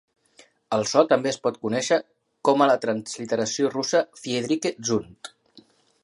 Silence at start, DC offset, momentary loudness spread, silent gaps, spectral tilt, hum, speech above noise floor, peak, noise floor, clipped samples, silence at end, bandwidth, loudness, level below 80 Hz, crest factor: 0.7 s; under 0.1%; 9 LU; none; -4 dB/octave; none; 34 dB; -4 dBFS; -57 dBFS; under 0.1%; 0.75 s; 11.5 kHz; -24 LUFS; -66 dBFS; 22 dB